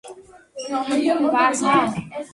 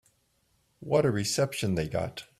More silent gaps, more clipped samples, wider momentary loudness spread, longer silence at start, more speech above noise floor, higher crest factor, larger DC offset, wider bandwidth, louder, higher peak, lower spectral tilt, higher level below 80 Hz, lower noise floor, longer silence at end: neither; neither; first, 14 LU vs 7 LU; second, 0.05 s vs 0.8 s; second, 23 dB vs 43 dB; about the same, 16 dB vs 18 dB; neither; second, 11.5 kHz vs 15 kHz; first, -20 LUFS vs -28 LUFS; first, -6 dBFS vs -12 dBFS; about the same, -4 dB/octave vs -5 dB/octave; about the same, -60 dBFS vs -56 dBFS; second, -43 dBFS vs -71 dBFS; about the same, 0.05 s vs 0.15 s